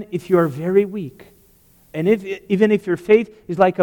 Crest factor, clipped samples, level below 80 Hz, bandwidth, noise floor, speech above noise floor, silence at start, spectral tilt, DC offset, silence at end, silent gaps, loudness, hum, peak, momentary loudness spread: 16 dB; under 0.1%; -58 dBFS; 19 kHz; -53 dBFS; 35 dB; 0 s; -8 dB/octave; under 0.1%; 0 s; none; -18 LUFS; none; -2 dBFS; 12 LU